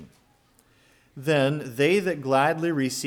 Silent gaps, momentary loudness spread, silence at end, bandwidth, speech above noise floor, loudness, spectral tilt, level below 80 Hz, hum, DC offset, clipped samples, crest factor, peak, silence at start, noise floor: none; 4 LU; 0 s; 19 kHz; 38 dB; -24 LUFS; -5 dB/octave; -66 dBFS; none; under 0.1%; under 0.1%; 18 dB; -8 dBFS; 0 s; -62 dBFS